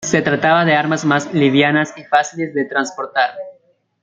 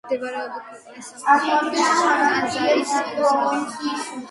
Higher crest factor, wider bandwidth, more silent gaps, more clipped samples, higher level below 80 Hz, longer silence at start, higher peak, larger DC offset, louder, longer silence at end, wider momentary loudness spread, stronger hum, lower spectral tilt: about the same, 16 dB vs 18 dB; second, 9 kHz vs 11.5 kHz; neither; neither; first, -60 dBFS vs -68 dBFS; about the same, 0 s vs 0.05 s; first, 0 dBFS vs -4 dBFS; neither; first, -16 LUFS vs -20 LUFS; first, 0.5 s vs 0 s; second, 8 LU vs 16 LU; neither; first, -4.5 dB/octave vs -2.5 dB/octave